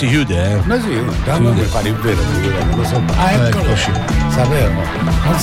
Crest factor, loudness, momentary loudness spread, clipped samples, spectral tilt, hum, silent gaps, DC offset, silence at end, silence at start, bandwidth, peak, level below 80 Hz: 10 dB; -15 LUFS; 3 LU; under 0.1%; -6 dB/octave; none; none; under 0.1%; 0 s; 0 s; 16.5 kHz; -4 dBFS; -22 dBFS